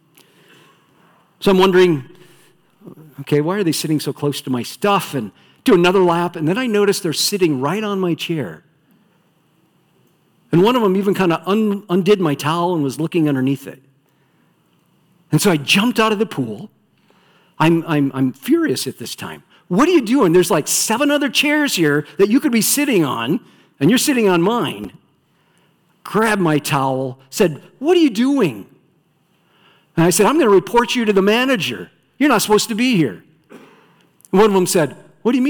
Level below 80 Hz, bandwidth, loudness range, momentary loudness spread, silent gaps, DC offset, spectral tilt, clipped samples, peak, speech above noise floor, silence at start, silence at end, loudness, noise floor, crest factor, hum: -54 dBFS; 19 kHz; 5 LU; 10 LU; none; under 0.1%; -4.5 dB/octave; under 0.1%; -4 dBFS; 44 dB; 1.4 s; 0 s; -16 LUFS; -60 dBFS; 14 dB; none